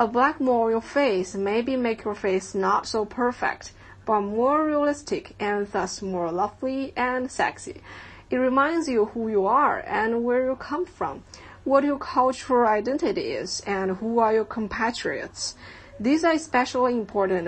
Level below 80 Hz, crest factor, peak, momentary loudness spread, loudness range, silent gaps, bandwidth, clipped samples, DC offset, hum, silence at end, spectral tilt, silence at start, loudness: -54 dBFS; 18 dB; -6 dBFS; 10 LU; 3 LU; none; 8.8 kHz; under 0.1%; under 0.1%; none; 0 s; -4.5 dB/octave; 0 s; -24 LUFS